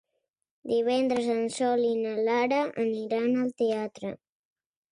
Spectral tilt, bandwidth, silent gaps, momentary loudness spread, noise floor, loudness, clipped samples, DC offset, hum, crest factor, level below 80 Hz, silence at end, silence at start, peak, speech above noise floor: -5 dB/octave; 11 kHz; none; 11 LU; -81 dBFS; -27 LUFS; under 0.1%; under 0.1%; none; 14 dB; -74 dBFS; 0.75 s; 0.65 s; -14 dBFS; 54 dB